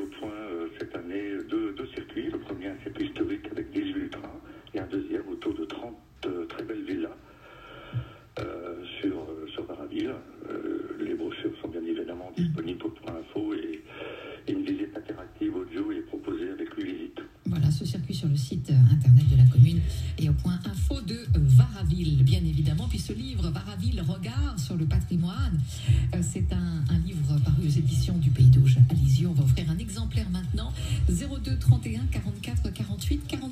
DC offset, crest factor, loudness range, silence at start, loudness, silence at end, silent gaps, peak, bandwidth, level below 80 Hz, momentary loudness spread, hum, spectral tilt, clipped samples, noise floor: under 0.1%; 18 dB; 14 LU; 0 s; -26 LUFS; 0 s; none; -6 dBFS; 14 kHz; -38 dBFS; 18 LU; none; -7.5 dB/octave; under 0.1%; -50 dBFS